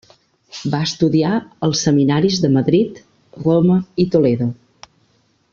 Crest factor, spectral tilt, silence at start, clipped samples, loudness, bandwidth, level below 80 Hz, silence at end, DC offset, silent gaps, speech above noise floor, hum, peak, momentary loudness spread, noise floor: 14 dB; -6 dB/octave; 0.55 s; under 0.1%; -17 LUFS; 7.4 kHz; -52 dBFS; 1 s; under 0.1%; none; 44 dB; none; -2 dBFS; 9 LU; -60 dBFS